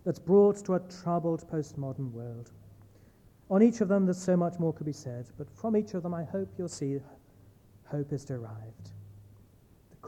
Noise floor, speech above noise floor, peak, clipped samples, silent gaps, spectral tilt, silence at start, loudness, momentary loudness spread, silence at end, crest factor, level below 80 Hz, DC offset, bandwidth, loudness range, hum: -60 dBFS; 30 dB; -12 dBFS; under 0.1%; none; -8 dB/octave; 0.05 s; -30 LUFS; 20 LU; 0 s; 20 dB; -66 dBFS; under 0.1%; 11 kHz; 9 LU; none